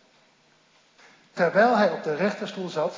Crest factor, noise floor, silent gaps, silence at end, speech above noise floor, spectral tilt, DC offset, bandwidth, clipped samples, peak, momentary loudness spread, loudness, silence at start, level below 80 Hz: 18 dB; -61 dBFS; none; 0 s; 38 dB; -6 dB/octave; under 0.1%; 7.6 kHz; under 0.1%; -8 dBFS; 12 LU; -23 LUFS; 1.35 s; -86 dBFS